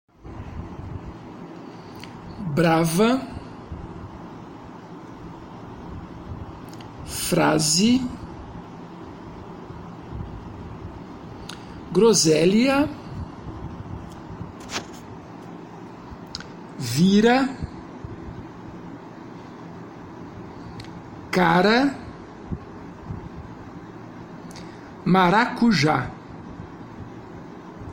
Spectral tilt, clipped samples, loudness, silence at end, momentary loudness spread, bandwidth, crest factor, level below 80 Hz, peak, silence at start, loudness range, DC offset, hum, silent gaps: -4.5 dB/octave; under 0.1%; -20 LUFS; 0 s; 22 LU; 16.5 kHz; 20 dB; -46 dBFS; -6 dBFS; 0.25 s; 16 LU; under 0.1%; none; none